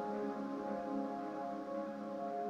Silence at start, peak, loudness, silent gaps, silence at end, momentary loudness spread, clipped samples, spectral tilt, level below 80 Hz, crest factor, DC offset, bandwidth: 0 s; -28 dBFS; -42 LUFS; none; 0 s; 3 LU; under 0.1%; -7.5 dB/octave; -76 dBFS; 12 dB; under 0.1%; 10 kHz